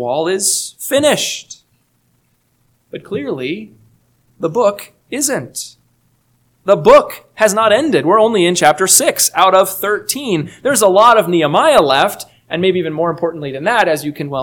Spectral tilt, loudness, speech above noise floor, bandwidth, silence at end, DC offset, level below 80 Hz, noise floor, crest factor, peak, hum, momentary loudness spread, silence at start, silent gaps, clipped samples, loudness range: -3 dB/octave; -13 LUFS; 47 dB; over 20 kHz; 0 s; under 0.1%; -52 dBFS; -60 dBFS; 14 dB; 0 dBFS; 60 Hz at -50 dBFS; 16 LU; 0 s; none; 0.4%; 11 LU